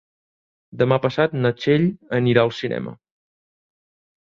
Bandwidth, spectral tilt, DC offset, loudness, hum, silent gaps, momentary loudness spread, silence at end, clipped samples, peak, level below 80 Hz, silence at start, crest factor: 7.2 kHz; -8 dB/octave; under 0.1%; -20 LUFS; none; none; 9 LU; 1.4 s; under 0.1%; -2 dBFS; -58 dBFS; 0.75 s; 22 dB